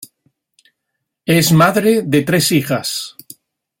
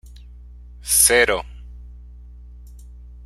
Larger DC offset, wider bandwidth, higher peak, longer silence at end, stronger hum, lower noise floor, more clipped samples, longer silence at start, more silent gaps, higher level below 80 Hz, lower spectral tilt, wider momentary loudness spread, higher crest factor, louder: neither; about the same, 16.5 kHz vs 16 kHz; about the same, 0 dBFS vs 0 dBFS; first, 0.7 s vs 0.05 s; second, none vs 60 Hz at -40 dBFS; first, -76 dBFS vs -41 dBFS; neither; about the same, 0 s vs 0.05 s; neither; second, -52 dBFS vs -38 dBFS; first, -4.5 dB/octave vs -1 dB/octave; second, 13 LU vs 23 LU; second, 16 dB vs 24 dB; about the same, -14 LUFS vs -15 LUFS